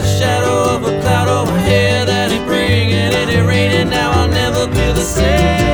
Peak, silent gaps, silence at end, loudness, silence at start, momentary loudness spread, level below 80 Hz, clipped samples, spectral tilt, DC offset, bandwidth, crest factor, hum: 0 dBFS; none; 0 s; -13 LUFS; 0 s; 3 LU; -24 dBFS; under 0.1%; -5 dB/octave; under 0.1%; over 20 kHz; 12 dB; none